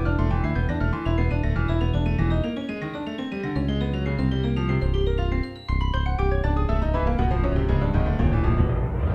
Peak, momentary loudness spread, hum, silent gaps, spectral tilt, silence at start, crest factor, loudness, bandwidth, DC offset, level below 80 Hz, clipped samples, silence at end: -8 dBFS; 6 LU; none; none; -9 dB/octave; 0 s; 14 dB; -24 LUFS; 6 kHz; under 0.1%; -26 dBFS; under 0.1%; 0 s